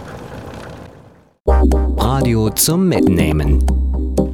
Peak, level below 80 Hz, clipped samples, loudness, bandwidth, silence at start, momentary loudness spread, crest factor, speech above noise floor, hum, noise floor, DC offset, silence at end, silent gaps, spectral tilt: 0 dBFS; -18 dBFS; under 0.1%; -15 LUFS; 17.5 kHz; 0 s; 18 LU; 16 dB; 31 dB; none; -45 dBFS; under 0.1%; 0 s; 1.40-1.44 s; -5.5 dB/octave